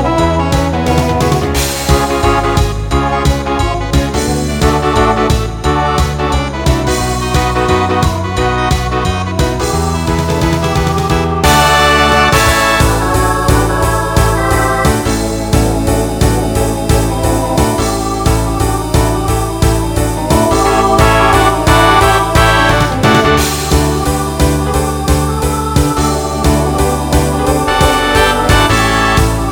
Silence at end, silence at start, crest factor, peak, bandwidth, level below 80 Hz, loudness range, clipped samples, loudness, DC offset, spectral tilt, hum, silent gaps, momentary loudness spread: 0 s; 0 s; 12 dB; 0 dBFS; 18.5 kHz; -18 dBFS; 4 LU; under 0.1%; -12 LUFS; under 0.1%; -5 dB/octave; none; none; 6 LU